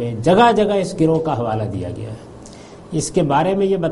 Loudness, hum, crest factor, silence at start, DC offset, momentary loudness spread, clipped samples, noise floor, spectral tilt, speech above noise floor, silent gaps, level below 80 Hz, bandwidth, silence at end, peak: -17 LUFS; none; 16 dB; 0 s; under 0.1%; 21 LU; under 0.1%; -38 dBFS; -6 dB/octave; 21 dB; none; -44 dBFS; 11.5 kHz; 0 s; -2 dBFS